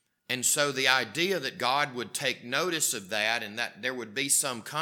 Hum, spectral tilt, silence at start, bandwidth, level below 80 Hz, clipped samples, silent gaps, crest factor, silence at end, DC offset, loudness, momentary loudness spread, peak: none; -1.5 dB/octave; 0.3 s; 19 kHz; -86 dBFS; under 0.1%; none; 24 dB; 0 s; under 0.1%; -27 LUFS; 8 LU; -4 dBFS